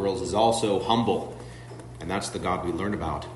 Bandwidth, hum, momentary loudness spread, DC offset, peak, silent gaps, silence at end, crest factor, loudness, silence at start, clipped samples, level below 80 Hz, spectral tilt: 11.5 kHz; none; 19 LU; under 0.1%; -8 dBFS; none; 0 s; 18 dB; -26 LUFS; 0 s; under 0.1%; -48 dBFS; -5 dB/octave